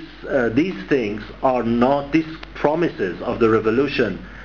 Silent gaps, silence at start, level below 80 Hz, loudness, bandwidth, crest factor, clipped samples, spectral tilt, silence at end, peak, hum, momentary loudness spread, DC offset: none; 0 s; -44 dBFS; -20 LUFS; 7 kHz; 18 dB; under 0.1%; -7.5 dB/octave; 0 s; -2 dBFS; none; 6 LU; 0.4%